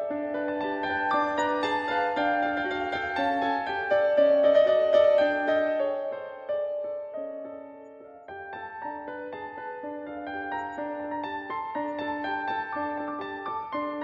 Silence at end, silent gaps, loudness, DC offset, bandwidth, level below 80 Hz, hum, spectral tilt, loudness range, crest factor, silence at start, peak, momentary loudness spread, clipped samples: 0 s; none; -27 LUFS; under 0.1%; 7.4 kHz; -68 dBFS; none; -5 dB/octave; 13 LU; 18 dB; 0 s; -10 dBFS; 16 LU; under 0.1%